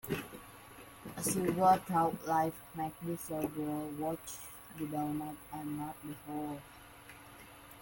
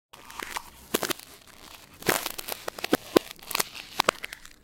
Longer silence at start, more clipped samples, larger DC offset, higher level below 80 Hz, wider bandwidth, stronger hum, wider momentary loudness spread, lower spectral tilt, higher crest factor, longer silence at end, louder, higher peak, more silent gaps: about the same, 0.05 s vs 0.15 s; neither; neither; second, -64 dBFS vs -58 dBFS; about the same, 17 kHz vs 17 kHz; neither; first, 23 LU vs 19 LU; first, -5 dB/octave vs -2.5 dB/octave; second, 20 dB vs 30 dB; second, 0 s vs 0.15 s; second, -36 LUFS vs -29 LUFS; second, -16 dBFS vs 0 dBFS; neither